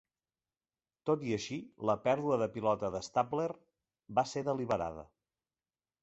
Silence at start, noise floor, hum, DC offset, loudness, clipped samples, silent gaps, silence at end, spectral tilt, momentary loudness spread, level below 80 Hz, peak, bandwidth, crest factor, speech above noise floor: 1.05 s; under -90 dBFS; none; under 0.1%; -34 LUFS; under 0.1%; none; 0.95 s; -5.5 dB/octave; 10 LU; -66 dBFS; -16 dBFS; 8 kHz; 20 dB; over 56 dB